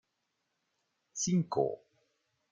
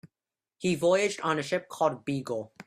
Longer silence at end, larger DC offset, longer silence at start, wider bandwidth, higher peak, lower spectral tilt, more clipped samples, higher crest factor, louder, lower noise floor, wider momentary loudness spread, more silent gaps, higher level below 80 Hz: first, 0.75 s vs 0.05 s; neither; first, 1.15 s vs 0.05 s; second, 9.4 kHz vs 15 kHz; second, -16 dBFS vs -10 dBFS; about the same, -5.5 dB/octave vs -5 dB/octave; neither; about the same, 20 dB vs 18 dB; second, -33 LUFS vs -29 LUFS; second, -83 dBFS vs under -90 dBFS; first, 15 LU vs 9 LU; neither; second, -74 dBFS vs -68 dBFS